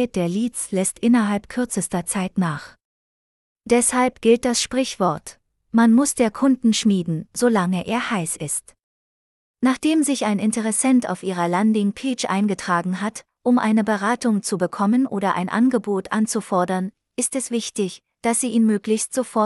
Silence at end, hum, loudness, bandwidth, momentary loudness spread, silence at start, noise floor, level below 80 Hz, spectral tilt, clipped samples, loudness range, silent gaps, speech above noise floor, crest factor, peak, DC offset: 0 s; none; -21 LUFS; 12 kHz; 8 LU; 0 s; under -90 dBFS; -58 dBFS; -4.5 dB/octave; under 0.1%; 3 LU; 2.85-3.56 s, 8.83-9.54 s; over 70 dB; 18 dB; -4 dBFS; under 0.1%